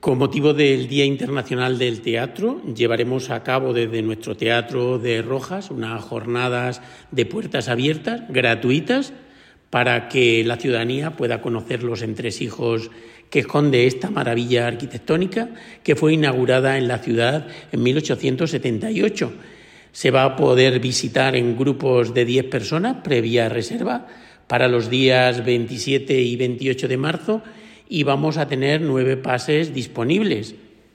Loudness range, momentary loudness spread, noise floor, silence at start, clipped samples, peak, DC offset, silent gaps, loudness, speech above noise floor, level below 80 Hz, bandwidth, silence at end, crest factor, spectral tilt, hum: 4 LU; 9 LU; -49 dBFS; 0.05 s; under 0.1%; -4 dBFS; under 0.1%; none; -20 LUFS; 30 dB; -58 dBFS; 14 kHz; 0.4 s; 16 dB; -5.5 dB/octave; none